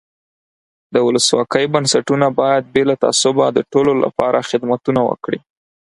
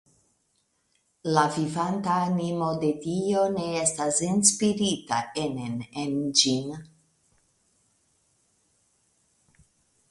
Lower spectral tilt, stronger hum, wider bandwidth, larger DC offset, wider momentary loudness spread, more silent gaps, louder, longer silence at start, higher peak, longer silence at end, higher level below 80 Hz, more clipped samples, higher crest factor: about the same, -4 dB/octave vs -3.5 dB/octave; neither; about the same, 11.5 kHz vs 11.5 kHz; neither; second, 5 LU vs 10 LU; neither; first, -15 LUFS vs -25 LUFS; second, 0.9 s vs 1.25 s; first, 0 dBFS vs -4 dBFS; second, 0.6 s vs 3.25 s; first, -54 dBFS vs -64 dBFS; neither; second, 16 dB vs 24 dB